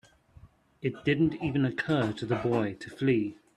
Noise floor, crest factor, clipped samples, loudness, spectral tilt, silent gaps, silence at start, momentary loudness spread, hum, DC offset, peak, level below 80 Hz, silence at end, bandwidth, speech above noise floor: -56 dBFS; 16 dB; under 0.1%; -29 LUFS; -7.5 dB/octave; none; 0.45 s; 6 LU; none; under 0.1%; -14 dBFS; -60 dBFS; 0.25 s; 11 kHz; 28 dB